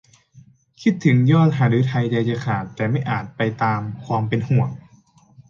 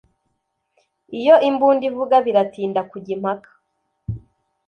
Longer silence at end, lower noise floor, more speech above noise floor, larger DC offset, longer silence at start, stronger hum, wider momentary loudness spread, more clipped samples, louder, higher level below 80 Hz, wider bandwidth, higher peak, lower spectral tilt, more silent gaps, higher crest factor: second, 0.1 s vs 0.5 s; second, -53 dBFS vs -73 dBFS; second, 34 dB vs 55 dB; neither; second, 0.35 s vs 1.1 s; neither; second, 9 LU vs 19 LU; neither; about the same, -20 LUFS vs -18 LUFS; about the same, -56 dBFS vs -52 dBFS; first, 7.2 kHz vs 6.4 kHz; about the same, -4 dBFS vs -2 dBFS; about the same, -8 dB/octave vs -7.5 dB/octave; neither; about the same, 16 dB vs 18 dB